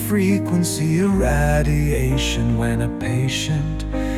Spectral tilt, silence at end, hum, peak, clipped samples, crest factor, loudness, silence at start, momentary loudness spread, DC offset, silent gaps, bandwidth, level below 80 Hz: -5.5 dB/octave; 0 s; none; -6 dBFS; under 0.1%; 14 dB; -20 LUFS; 0 s; 5 LU; under 0.1%; none; 16 kHz; -26 dBFS